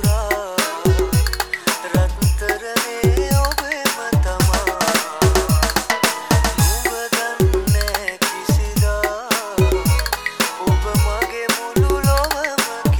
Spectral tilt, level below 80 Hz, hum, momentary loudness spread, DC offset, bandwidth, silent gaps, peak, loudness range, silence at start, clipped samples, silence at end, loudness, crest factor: -4.5 dB/octave; -24 dBFS; none; 4 LU; under 0.1%; over 20 kHz; none; 0 dBFS; 2 LU; 0 s; under 0.1%; 0 s; -18 LUFS; 18 dB